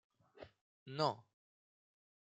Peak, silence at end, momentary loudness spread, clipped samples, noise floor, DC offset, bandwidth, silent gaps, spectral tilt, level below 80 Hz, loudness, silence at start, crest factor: -20 dBFS; 1.15 s; 22 LU; under 0.1%; -61 dBFS; under 0.1%; 9 kHz; 0.61-0.86 s; -5.5 dB/octave; -86 dBFS; -40 LUFS; 0.35 s; 26 dB